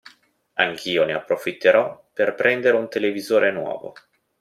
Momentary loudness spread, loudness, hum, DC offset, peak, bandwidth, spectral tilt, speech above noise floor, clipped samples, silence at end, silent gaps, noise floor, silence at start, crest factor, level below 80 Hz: 12 LU; -21 LUFS; none; under 0.1%; -2 dBFS; 15 kHz; -4.5 dB/octave; 35 dB; under 0.1%; 0.5 s; none; -56 dBFS; 0.55 s; 20 dB; -68 dBFS